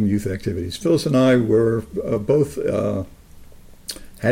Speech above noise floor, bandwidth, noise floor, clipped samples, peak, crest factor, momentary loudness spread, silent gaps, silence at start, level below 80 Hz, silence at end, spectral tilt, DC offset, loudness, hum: 23 dB; 16.5 kHz; -42 dBFS; under 0.1%; -6 dBFS; 14 dB; 18 LU; none; 0 s; -44 dBFS; 0 s; -6.5 dB/octave; under 0.1%; -20 LUFS; none